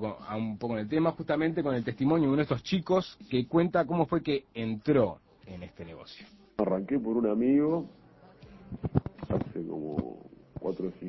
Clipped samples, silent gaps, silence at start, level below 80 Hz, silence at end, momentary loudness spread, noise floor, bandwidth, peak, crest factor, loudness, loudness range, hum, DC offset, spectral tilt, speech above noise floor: under 0.1%; none; 0 s; -54 dBFS; 0 s; 19 LU; -55 dBFS; 6 kHz; -10 dBFS; 20 dB; -30 LUFS; 4 LU; none; under 0.1%; -8.5 dB/octave; 25 dB